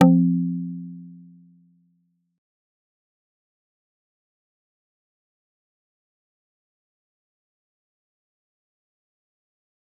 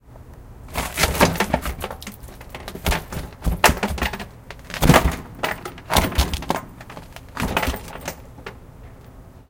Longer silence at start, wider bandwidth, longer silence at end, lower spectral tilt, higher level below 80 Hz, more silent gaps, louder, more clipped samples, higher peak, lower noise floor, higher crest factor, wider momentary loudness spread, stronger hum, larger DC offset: about the same, 0 s vs 0.1 s; second, 3.6 kHz vs 17 kHz; first, 8.85 s vs 0.1 s; first, -9 dB/octave vs -4 dB/octave; second, -78 dBFS vs -30 dBFS; neither; about the same, -22 LUFS vs -22 LUFS; neither; about the same, -2 dBFS vs 0 dBFS; first, -69 dBFS vs -43 dBFS; about the same, 26 dB vs 24 dB; first, 24 LU vs 21 LU; neither; neither